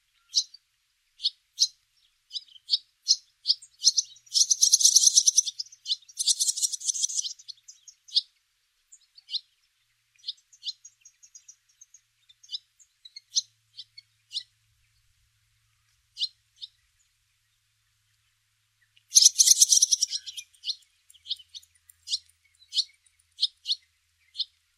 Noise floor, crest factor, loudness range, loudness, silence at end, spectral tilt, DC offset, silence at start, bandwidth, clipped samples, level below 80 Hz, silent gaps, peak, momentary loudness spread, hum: -73 dBFS; 28 dB; 20 LU; -23 LUFS; 0.35 s; 8.5 dB/octave; under 0.1%; 0.35 s; 16 kHz; under 0.1%; -82 dBFS; none; -2 dBFS; 22 LU; none